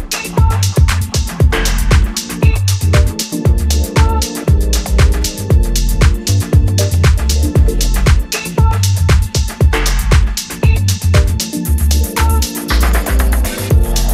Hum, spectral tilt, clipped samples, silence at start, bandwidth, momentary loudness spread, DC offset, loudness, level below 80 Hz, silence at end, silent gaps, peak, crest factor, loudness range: none; -5 dB/octave; under 0.1%; 0 s; 16 kHz; 4 LU; under 0.1%; -14 LUFS; -14 dBFS; 0 s; none; 0 dBFS; 12 dB; 1 LU